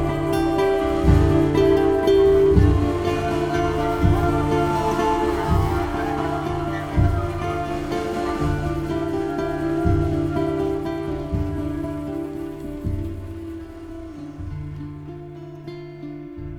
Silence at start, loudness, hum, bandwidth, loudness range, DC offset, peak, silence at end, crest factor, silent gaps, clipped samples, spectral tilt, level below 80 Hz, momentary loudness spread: 0 s; -21 LUFS; none; 16.5 kHz; 14 LU; under 0.1%; -2 dBFS; 0 s; 18 dB; none; under 0.1%; -7.5 dB/octave; -30 dBFS; 18 LU